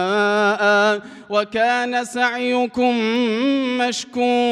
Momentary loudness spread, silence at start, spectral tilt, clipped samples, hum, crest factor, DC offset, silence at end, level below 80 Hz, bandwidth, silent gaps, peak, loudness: 6 LU; 0 s; -3.5 dB/octave; under 0.1%; none; 14 dB; under 0.1%; 0 s; -64 dBFS; 12 kHz; none; -4 dBFS; -19 LUFS